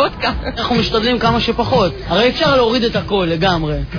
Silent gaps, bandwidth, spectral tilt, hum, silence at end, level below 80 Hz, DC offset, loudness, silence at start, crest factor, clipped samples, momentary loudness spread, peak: none; 5.4 kHz; -6 dB/octave; none; 0 s; -30 dBFS; under 0.1%; -15 LUFS; 0 s; 14 dB; under 0.1%; 5 LU; -2 dBFS